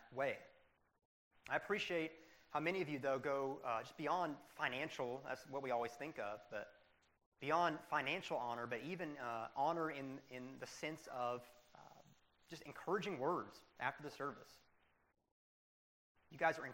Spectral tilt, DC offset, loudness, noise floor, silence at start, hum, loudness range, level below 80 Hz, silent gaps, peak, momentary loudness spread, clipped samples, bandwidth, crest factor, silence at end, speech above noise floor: -5 dB/octave; under 0.1%; -43 LUFS; -76 dBFS; 0 s; none; 5 LU; -82 dBFS; 1.05-1.31 s, 7.26-7.32 s, 15.32-16.15 s; -22 dBFS; 12 LU; under 0.1%; 16 kHz; 22 dB; 0 s; 33 dB